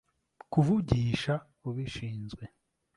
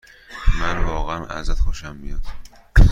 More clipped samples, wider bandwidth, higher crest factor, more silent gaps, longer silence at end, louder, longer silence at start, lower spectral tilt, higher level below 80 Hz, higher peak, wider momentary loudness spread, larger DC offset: neither; first, 11.5 kHz vs 7.6 kHz; about the same, 20 dB vs 18 dB; neither; first, 0.5 s vs 0 s; second, -31 LUFS vs -25 LUFS; first, 0.5 s vs 0.3 s; first, -7.5 dB/octave vs -6 dB/octave; second, -50 dBFS vs -20 dBFS; second, -10 dBFS vs 0 dBFS; about the same, 16 LU vs 16 LU; neither